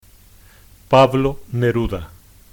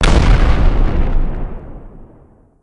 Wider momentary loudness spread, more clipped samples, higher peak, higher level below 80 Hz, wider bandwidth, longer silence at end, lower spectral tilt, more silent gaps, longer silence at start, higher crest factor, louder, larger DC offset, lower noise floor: second, 11 LU vs 22 LU; neither; about the same, -2 dBFS vs 0 dBFS; second, -36 dBFS vs -14 dBFS; first, 19.5 kHz vs 10.5 kHz; second, 0.45 s vs 0.6 s; about the same, -7 dB/octave vs -6 dB/octave; neither; first, 0.9 s vs 0 s; about the same, 16 dB vs 12 dB; about the same, -17 LUFS vs -17 LUFS; neither; about the same, -47 dBFS vs -46 dBFS